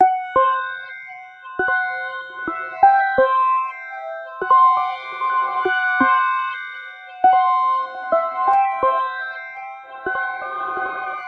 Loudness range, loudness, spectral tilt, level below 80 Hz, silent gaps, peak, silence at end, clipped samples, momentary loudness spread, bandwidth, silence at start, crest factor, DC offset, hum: 3 LU; -19 LUFS; -5 dB/octave; -60 dBFS; none; -2 dBFS; 0 s; under 0.1%; 16 LU; 5.4 kHz; 0 s; 18 dB; under 0.1%; none